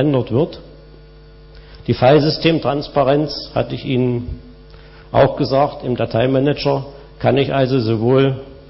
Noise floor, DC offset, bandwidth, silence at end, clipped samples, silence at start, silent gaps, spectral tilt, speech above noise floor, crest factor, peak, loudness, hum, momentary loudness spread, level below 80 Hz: -41 dBFS; under 0.1%; 6 kHz; 0.1 s; under 0.1%; 0 s; none; -10 dB/octave; 25 dB; 16 dB; -2 dBFS; -17 LUFS; none; 10 LU; -40 dBFS